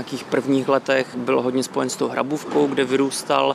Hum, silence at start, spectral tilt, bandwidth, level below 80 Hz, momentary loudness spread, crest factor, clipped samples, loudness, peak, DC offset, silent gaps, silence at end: none; 0 s; -4.5 dB/octave; 14.5 kHz; -68 dBFS; 4 LU; 16 dB; under 0.1%; -21 LUFS; -4 dBFS; under 0.1%; none; 0 s